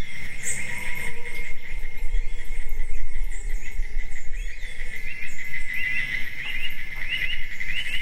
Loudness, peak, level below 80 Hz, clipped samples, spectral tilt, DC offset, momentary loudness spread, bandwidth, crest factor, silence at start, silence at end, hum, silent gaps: -31 LUFS; -6 dBFS; -28 dBFS; under 0.1%; -2 dB/octave; under 0.1%; 10 LU; 12.5 kHz; 12 dB; 0 s; 0 s; none; none